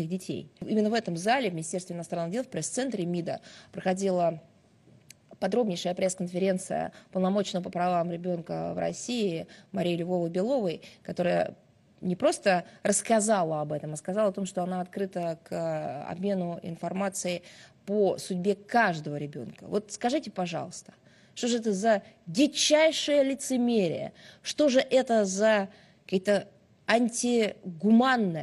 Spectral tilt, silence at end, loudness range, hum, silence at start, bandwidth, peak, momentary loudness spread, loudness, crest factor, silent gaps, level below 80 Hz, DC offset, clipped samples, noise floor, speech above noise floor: -4.5 dB/octave; 0 s; 6 LU; none; 0 s; 13 kHz; -8 dBFS; 12 LU; -28 LUFS; 20 dB; none; -72 dBFS; under 0.1%; under 0.1%; -59 dBFS; 31 dB